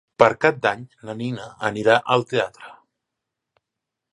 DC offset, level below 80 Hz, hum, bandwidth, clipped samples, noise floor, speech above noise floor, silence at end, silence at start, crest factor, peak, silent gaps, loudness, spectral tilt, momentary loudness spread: under 0.1%; -62 dBFS; none; 11 kHz; under 0.1%; -84 dBFS; 63 dB; 1.4 s; 0.2 s; 22 dB; 0 dBFS; none; -21 LUFS; -5.5 dB/octave; 13 LU